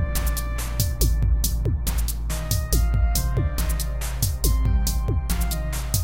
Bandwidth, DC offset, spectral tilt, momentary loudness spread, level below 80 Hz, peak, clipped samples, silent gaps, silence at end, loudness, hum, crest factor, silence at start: 17 kHz; 0.8%; -4.5 dB/octave; 5 LU; -24 dBFS; -6 dBFS; under 0.1%; none; 0 s; -24 LUFS; none; 16 dB; 0 s